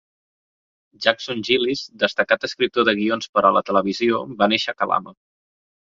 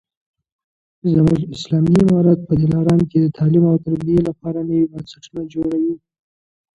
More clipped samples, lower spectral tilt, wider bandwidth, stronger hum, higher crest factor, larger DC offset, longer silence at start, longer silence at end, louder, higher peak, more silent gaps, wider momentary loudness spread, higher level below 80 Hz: neither; second, -4.5 dB/octave vs -9 dB/octave; about the same, 7.6 kHz vs 8.2 kHz; neither; about the same, 20 dB vs 16 dB; neither; about the same, 1 s vs 1.05 s; about the same, 0.75 s vs 0.8 s; second, -20 LUFS vs -17 LUFS; about the same, -2 dBFS vs -2 dBFS; first, 3.29-3.33 s vs none; second, 5 LU vs 11 LU; second, -64 dBFS vs -44 dBFS